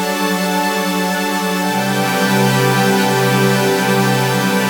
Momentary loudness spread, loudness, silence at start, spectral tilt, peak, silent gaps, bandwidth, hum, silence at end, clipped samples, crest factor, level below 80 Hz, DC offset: 4 LU; -15 LUFS; 0 s; -4.5 dB/octave; -2 dBFS; none; over 20 kHz; none; 0 s; under 0.1%; 14 dB; -62 dBFS; under 0.1%